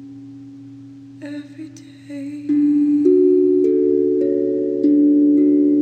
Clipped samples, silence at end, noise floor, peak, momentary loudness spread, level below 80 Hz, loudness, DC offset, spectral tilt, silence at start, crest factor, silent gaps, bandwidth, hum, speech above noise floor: under 0.1%; 0 s; -38 dBFS; -4 dBFS; 22 LU; -72 dBFS; -16 LUFS; under 0.1%; -9 dB/octave; 0 s; 12 dB; none; 4.3 kHz; none; 17 dB